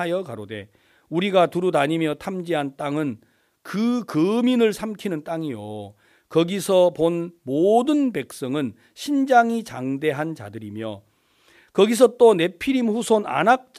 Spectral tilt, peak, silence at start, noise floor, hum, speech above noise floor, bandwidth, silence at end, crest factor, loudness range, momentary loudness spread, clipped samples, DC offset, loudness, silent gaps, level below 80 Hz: -5.5 dB/octave; -4 dBFS; 0 s; -58 dBFS; none; 37 dB; 15.5 kHz; 0.2 s; 18 dB; 3 LU; 16 LU; under 0.1%; under 0.1%; -21 LUFS; none; -64 dBFS